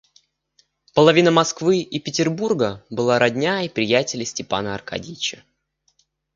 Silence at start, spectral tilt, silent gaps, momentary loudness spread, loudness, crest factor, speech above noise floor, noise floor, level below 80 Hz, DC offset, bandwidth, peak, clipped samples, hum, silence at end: 0.95 s; -4.5 dB/octave; none; 12 LU; -20 LUFS; 20 dB; 46 dB; -66 dBFS; -58 dBFS; under 0.1%; 7.6 kHz; 0 dBFS; under 0.1%; none; 1.05 s